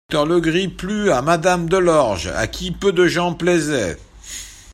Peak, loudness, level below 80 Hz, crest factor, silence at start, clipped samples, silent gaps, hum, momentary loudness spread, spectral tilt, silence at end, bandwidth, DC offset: 0 dBFS; -18 LUFS; -40 dBFS; 18 dB; 0.1 s; under 0.1%; none; none; 14 LU; -5 dB/octave; 0.15 s; 15 kHz; under 0.1%